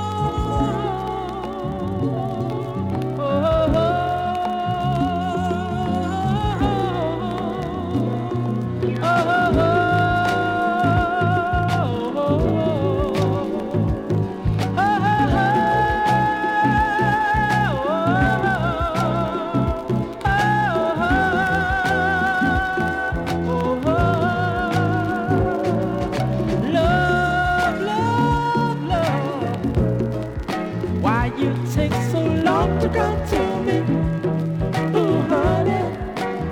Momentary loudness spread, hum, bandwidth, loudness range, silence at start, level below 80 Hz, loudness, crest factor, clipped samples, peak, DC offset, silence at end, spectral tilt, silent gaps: 6 LU; none; 16.5 kHz; 3 LU; 0 s; -34 dBFS; -20 LUFS; 14 dB; under 0.1%; -6 dBFS; under 0.1%; 0 s; -7 dB/octave; none